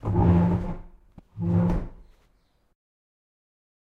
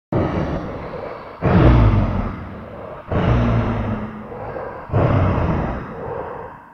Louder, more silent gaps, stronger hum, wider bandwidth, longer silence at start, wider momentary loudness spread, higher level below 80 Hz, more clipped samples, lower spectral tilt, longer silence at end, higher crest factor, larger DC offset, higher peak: second, -24 LUFS vs -20 LUFS; neither; neither; second, 3.8 kHz vs 6.2 kHz; about the same, 0.05 s vs 0.1 s; about the same, 19 LU vs 17 LU; second, -38 dBFS vs -26 dBFS; neither; first, -11 dB/octave vs -9.5 dB/octave; first, 1.95 s vs 0 s; about the same, 18 dB vs 20 dB; neither; second, -8 dBFS vs 0 dBFS